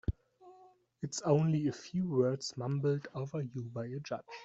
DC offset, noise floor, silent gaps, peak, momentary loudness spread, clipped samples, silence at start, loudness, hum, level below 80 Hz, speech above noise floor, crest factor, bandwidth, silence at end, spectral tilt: under 0.1%; -62 dBFS; none; -16 dBFS; 11 LU; under 0.1%; 0.1 s; -35 LUFS; none; -54 dBFS; 28 dB; 20 dB; 8 kHz; 0 s; -6.5 dB/octave